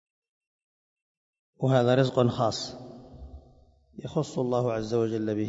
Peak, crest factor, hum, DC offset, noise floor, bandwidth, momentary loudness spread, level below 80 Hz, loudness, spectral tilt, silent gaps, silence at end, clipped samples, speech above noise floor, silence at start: -8 dBFS; 20 dB; none; under 0.1%; -58 dBFS; 7.8 kHz; 23 LU; -56 dBFS; -27 LUFS; -6.5 dB/octave; none; 0 s; under 0.1%; 32 dB; 1.6 s